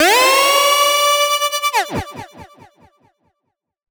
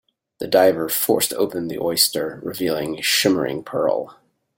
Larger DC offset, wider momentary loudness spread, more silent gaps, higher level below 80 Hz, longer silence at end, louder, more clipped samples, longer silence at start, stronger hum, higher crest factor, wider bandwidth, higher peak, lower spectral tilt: neither; first, 15 LU vs 10 LU; neither; first, -48 dBFS vs -60 dBFS; first, 1.45 s vs 0.45 s; first, -13 LUFS vs -20 LUFS; neither; second, 0 s vs 0.4 s; neither; second, 14 dB vs 20 dB; first, over 20 kHz vs 17 kHz; about the same, -2 dBFS vs -2 dBFS; second, -0.5 dB/octave vs -3 dB/octave